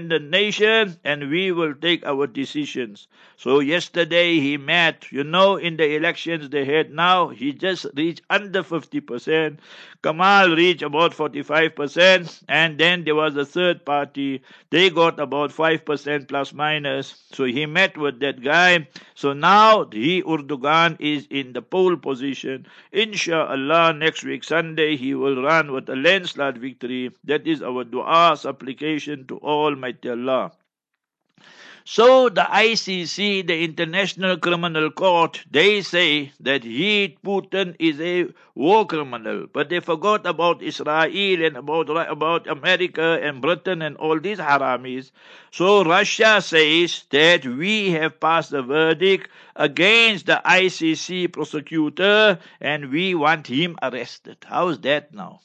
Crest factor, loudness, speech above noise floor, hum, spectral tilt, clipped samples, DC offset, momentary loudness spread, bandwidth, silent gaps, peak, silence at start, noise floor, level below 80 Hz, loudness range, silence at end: 20 dB; -19 LUFS; 62 dB; none; -4.5 dB/octave; under 0.1%; under 0.1%; 12 LU; 8.6 kHz; none; 0 dBFS; 0 s; -82 dBFS; -74 dBFS; 5 LU; 0.1 s